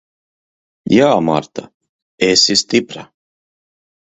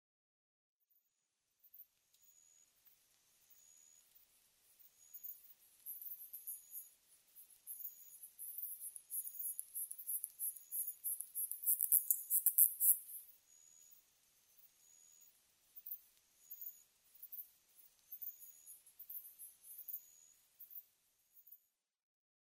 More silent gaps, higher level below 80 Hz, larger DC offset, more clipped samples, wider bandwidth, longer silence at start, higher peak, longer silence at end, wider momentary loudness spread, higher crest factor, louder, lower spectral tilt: first, 1.74-1.80 s, 1.89-2.18 s vs none; first, -54 dBFS vs under -90 dBFS; neither; neither; second, 8.4 kHz vs 16 kHz; second, 0.85 s vs 1.65 s; first, 0 dBFS vs -8 dBFS; about the same, 1.1 s vs 1.05 s; second, 20 LU vs 26 LU; second, 18 dB vs 38 dB; first, -13 LUFS vs -39 LUFS; first, -3.5 dB/octave vs 3.5 dB/octave